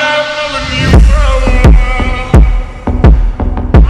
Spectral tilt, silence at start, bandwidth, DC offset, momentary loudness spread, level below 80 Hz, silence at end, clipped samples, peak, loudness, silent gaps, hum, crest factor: -6.5 dB/octave; 0 s; 9.6 kHz; under 0.1%; 8 LU; -8 dBFS; 0 s; 5%; 0 dBFS; -10 LUFS; none; none; 6 dB